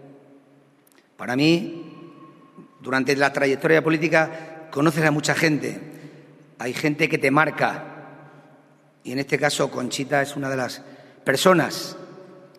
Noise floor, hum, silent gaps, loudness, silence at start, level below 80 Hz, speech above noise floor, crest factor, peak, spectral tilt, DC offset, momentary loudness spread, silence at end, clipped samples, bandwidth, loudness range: -57 dBFS; none; none; -22 LUFS; 0.05 s; -68 dBFS; 36 dB; 24 dB; 0 dBFS; -5 dB/octave; under 0.1%; 20 LU; 0.15 s; under 0.1%; 13.5 kHz; 5 LU